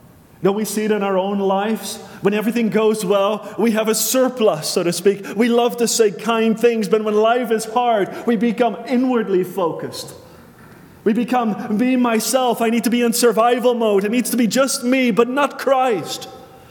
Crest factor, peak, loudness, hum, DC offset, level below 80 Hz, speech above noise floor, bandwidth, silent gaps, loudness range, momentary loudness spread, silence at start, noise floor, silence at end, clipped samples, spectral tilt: 16 dB; -2 dBFS; -18 LUFS; none; under 0.1%; -66 dBFS; 26 dB; 19 kHz; none; 4 LU; 6 LU; 0.4 s; -43 dBFS; 0.15 s; under 0.1%; -4 dB/octave